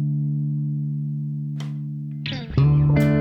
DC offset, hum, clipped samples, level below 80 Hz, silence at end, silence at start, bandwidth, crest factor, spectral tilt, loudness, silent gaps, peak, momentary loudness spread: under 0.1%; none; under 0.1%; -40 dBFS; 0 s; 0 s; 6 kHz; 16 dB; -8.5 dB/octave; -23 LUFS; none; -6 dBFS; 12 LU